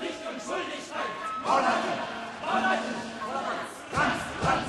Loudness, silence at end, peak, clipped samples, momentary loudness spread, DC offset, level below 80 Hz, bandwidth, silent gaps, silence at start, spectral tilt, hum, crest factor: -29 LUFS; 0 s; -12 dBFS; under 0.1%; 9 LU; under 0.1%; -54 dBFS; 12.5 kHz; none; 0 s; -4 dB/octave; none; 18 dB